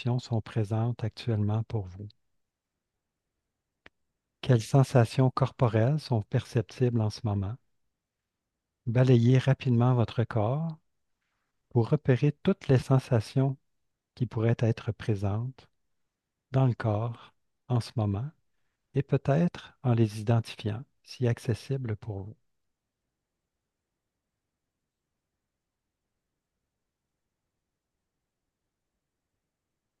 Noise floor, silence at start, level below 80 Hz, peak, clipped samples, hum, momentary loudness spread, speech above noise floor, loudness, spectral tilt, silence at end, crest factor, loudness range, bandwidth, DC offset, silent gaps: -86 dBFS; 0 s; -64 dBFS; -8 dBFS; under 0.1%; none; 13 LU; 59 dB; -28 LUFS; -8 dB/octave; 7.65 s; 22 dB; 9 LU; 11.5 kHz; under 0.1%; none